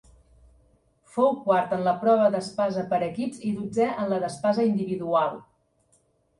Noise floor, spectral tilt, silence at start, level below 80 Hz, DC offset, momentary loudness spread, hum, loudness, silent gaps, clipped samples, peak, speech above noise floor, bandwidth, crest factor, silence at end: -66 dBFS; -6.5 dB/octave; 1.15 s; -64 dBFS; under 0.1%; 8 LU; none; -25 LUFS; none; under 0.1%; -8 dBFS; 42 dB; 11.5 kHz; 18 dB; 0.95 s